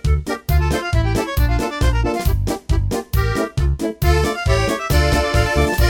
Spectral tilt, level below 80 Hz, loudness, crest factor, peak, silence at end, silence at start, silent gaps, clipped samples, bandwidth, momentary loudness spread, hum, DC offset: -5.5 dB/octave; -20 dBFS; -19 LUFS; 14 dB; -2 dBFS; 0 s; 0.05 s; none; under 0.1%; 17.5 kHz; 4 LU; none; under 0.1%